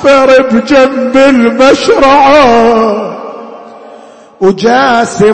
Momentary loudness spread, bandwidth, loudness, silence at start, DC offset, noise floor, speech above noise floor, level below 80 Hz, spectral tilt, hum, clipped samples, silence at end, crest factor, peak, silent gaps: 11 LU; 8.8 kHz; -6 LUFS; 0 s; under 0.1%; -33 dBFS; 28 dB; -36 dBFS; -4.5 dB/octave; none; 2%; 0 s; 6 dB; 0 dBFS; none